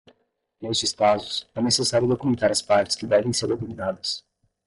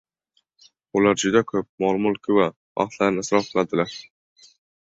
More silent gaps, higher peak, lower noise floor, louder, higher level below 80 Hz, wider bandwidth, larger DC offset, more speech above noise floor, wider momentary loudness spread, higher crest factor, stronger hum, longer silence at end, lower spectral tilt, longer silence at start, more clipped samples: second, none vs 1.69-1.78 s, 2.56-2.75 s; second, -8 dBFS vs -4 dBFS; second, -66 dBFS vs -70 dBFS; about the same, -23 LUFS vs -22 LUFS; about the same, -58 dBFS vs -60 dBFS; first, 11.5 kHz vs 8 kHz; neither; second, 43 dB vs 49 dB; about the same, 9 LU vs 8 LU; about the same, 16 dB vs 20 dB; neither; second, 0.5 s vs 0.85 s; second, -3.5 dB/octave vs -5 dB/octave; second, 0.6 s vs 0.95 s; neither